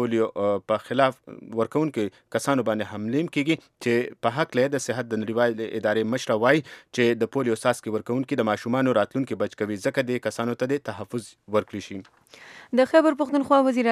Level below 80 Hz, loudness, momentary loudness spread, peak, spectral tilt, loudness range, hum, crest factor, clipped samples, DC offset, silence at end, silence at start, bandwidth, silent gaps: -72 dBFS; -25 LUFS; 9 LU; -4 dBFS; -5.5 dB/octave; 3 LU; none; 22 dB; under 0.1%; under 0.1%; 0 s; 0 s; 14.5 kHz; none